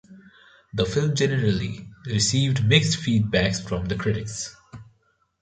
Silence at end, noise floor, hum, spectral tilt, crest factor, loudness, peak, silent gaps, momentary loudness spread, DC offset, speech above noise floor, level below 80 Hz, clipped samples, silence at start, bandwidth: 0.6 s; -66 dBFS; none; -4.5 dB/octave; 22 dB; -23 LUFS; -2 dBFS; none; 14 LU; under 0.1%; 44 dB; -46 dBFS; under 0.1%; 0.1 s; 9.6 kHz